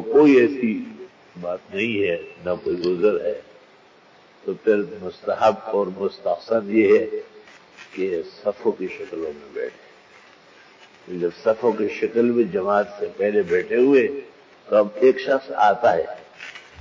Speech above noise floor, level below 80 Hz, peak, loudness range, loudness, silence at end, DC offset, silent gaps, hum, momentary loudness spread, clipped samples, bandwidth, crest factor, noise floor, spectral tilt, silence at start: 31 dB; -62 dBFS; -6 dBFS; 9 LU; -21 LUFS; 0.2 s; under 0.1%; none; none; 16 LU; under 0.1%; 7.4 kHz; 16 dB; -52 dBFS; -7 dB/octave; 0 s